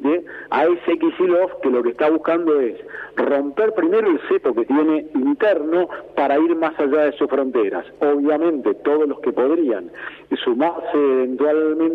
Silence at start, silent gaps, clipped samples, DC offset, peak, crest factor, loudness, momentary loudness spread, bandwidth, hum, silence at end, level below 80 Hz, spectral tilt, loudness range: 0 s; none; under 0.1%; under 0.1%; -6 dBFS; 12 dB; -19 LUFS; 6 LU; 4.7 kHz; none; 0 s; -62 dBFS; -7.5 dB/octave; 1 LU